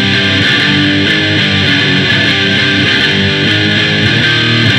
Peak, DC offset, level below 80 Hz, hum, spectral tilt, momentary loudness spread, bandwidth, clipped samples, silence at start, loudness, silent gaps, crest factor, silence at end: 0 dBFS; under 0.1%; -42 dBFS; none; -4.5 dB/octave; 1 LU; 12 kHz; under 0.1%; 0 s; -8 LUFS; none; 10 dB; 0 s